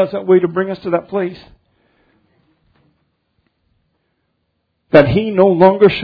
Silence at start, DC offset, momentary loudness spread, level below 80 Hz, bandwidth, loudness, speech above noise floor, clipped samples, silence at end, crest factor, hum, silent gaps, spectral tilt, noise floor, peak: 0 s; under 0.1%; 11 LU; -46 dBFS; 5.4 kHz; -13 LUFS; 56 dB; 0.2%; 0 s; 16 dB; none; none; -9.5 dB/octave; -68 dBFS; 0 dBFS